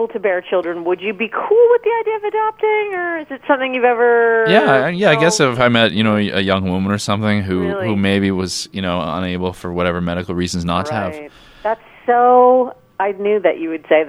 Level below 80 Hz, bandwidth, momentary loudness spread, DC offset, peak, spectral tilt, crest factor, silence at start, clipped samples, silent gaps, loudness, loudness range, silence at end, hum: -48 dBFS; 12.5 kHz; 10 LU; under 0.1%; 0 dBFS; -5 dB/octave; 16 dB; 0 s; under 0.1%; none; -16 LUFS; 6 LU; 0 s; none